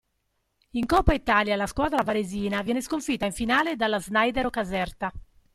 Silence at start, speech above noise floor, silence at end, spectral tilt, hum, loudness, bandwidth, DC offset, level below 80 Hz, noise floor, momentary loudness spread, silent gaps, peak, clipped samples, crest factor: 0.75 s; 50 dB; 0.35 s; -5 dB/octave; none; -25 LUFS; 15.5 kHz; under 0.1%; -40 dBFS; -75 dBFS; 8 LU; none; -6 dBFS; under 0.1%; 20 dB